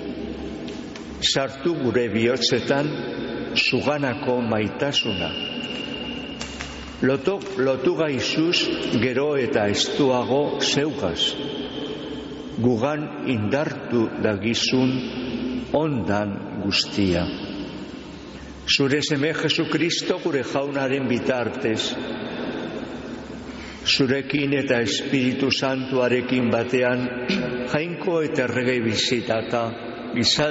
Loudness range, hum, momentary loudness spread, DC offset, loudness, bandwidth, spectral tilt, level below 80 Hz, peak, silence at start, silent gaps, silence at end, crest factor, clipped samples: 4 LU; none; 12 LU; under 0.1%; -23 LUFS; 8 kHz; -3.5 dB/octave; -50 dBFS; -6 dBFS; 0 s; none; 0 s; 16 dB; under 0.1%